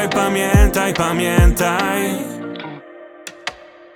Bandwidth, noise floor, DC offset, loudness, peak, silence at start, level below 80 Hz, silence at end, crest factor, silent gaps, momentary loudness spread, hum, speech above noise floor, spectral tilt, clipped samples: 19.5 kHz; -39 dBFS; under 0.1%; -16 LUFS; -2 dBFS; 0 s; -22 dBFS; 0.4 s; 16 dB; none; 18 LU; none; 23 dB; -5 dB/octave; under 0.1%